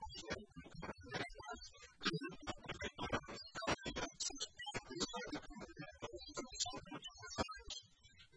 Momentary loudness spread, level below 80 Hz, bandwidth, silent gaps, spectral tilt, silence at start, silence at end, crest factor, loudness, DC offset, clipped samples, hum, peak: 10 LU; -62 dBFS; 10.5 kHz; none; -3 dB/octave; 0 s; 0 s; 24 dB; -46 LUFS; under 0.1%; under 0.1%; none; -24 dBFS